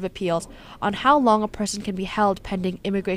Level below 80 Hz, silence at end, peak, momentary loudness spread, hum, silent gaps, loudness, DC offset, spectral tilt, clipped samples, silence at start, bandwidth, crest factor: -46 dBFS; 0 s; -4 dBFS; 10 LU; none; none; -23 LUFS; under 0.1%; -5 dB/octave; under 0.1%; 0 s; 15.5 kHz; 18 dB